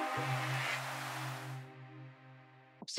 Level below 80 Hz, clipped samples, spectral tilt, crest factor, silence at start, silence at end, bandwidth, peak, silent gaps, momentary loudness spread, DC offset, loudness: -82 dBFS; under 0.1%; -4 dB/octave; 28 dB; 0 s; 0 s; 16 kHz; -12 dBFS; none; 22 LU; under 0.1%; -38 LUFS